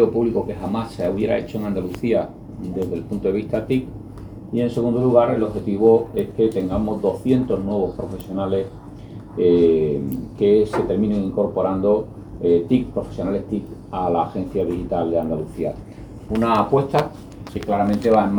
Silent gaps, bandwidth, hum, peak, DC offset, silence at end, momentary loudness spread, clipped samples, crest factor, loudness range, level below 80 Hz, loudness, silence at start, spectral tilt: none; over 20 kHz; none; -2 dBFS; under 0.1%; 0 s; 14 LU; under 0.1%; 18 dB; 5 LU; -42 dBFS; -21 LUFS; 0 s; -8.5 dB/octave